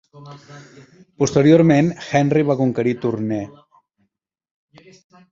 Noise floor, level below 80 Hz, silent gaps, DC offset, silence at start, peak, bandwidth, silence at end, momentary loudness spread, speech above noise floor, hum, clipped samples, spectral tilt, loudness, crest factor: -72 dBFS; -56 dBFS; none; under 0.1%; 0.15 s; -2 dBFS; 7.8 kHz; 1.8 s; 13 LU; 53 dB; none; under 0.1%; -7 dB/octave; -17 LUFS; 18 dB